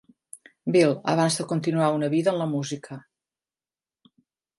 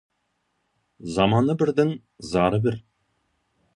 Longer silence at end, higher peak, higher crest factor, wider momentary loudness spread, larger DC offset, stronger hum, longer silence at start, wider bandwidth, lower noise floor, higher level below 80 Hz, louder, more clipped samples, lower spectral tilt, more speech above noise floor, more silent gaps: first, 1.6 s vs 0.95 s; about the same, -8 dBFS vs -6 dBFS; about the same, 18 dB vs 20 dB; about the same, 14 LU vs 16 LU; neither; neither; second, 0.35 s vs 1 s; about the same, 11.5 kHz vs 11 kHz; first, under -90 dBFS vs -74 dBFS; second, -72 dBFS vs -52 dBFS; about the same, -24 LUFS vs -23 LUFS; neither; second, -5.5 dB/octave vs -7 dB/octave; first, over 67 dB vs 52 dB; neither